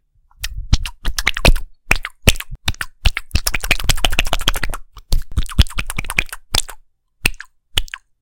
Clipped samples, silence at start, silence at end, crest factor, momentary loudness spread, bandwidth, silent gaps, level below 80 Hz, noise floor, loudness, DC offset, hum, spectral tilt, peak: 0.1%; 0.4 s; 0.25 s; 18 dB; 12 LU; 17.5 kHz; none; -22 dBFS; -43 dBFS; -20 LUFS; under 0.1%; none; -3 dB/octave; 0 dBFS